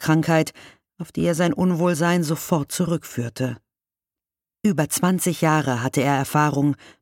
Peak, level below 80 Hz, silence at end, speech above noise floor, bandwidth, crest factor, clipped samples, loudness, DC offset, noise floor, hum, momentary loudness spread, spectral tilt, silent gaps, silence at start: -4 dBFS; -56 dBFS; 0.25 s; over 69 dB; 17 kHz; 16 dB; under 0.1%; -21 LUFS; under 0.1%; under -90 dBFS; none; 9 LU; -5.5 dB/octave; none; 0 s